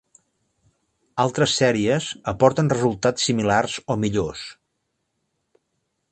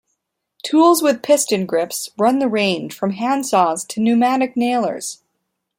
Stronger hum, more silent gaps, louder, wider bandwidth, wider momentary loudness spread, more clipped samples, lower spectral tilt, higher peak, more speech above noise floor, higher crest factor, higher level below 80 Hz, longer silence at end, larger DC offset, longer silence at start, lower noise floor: neither; neither; second, -21 LUFS vs -17 LUFS; second, 9 kHz vs 16.5 kHz; about the same, 11 LU vs 10 LU; neither; about the same, -4.5 dB/octave vs -4 dB/octave; about the same, 0 dBFS vs -2 dBFS; about the same, 54 dB vs 57 dB; first, 22 dB vs 16 dB; first, -52 dBFS vs -66 dBFS; first, 1.6 s vs 0.65 s; neither; first, 1.15 s vs 0.65 s; about the same, -75 dBFS vs -74 dBFS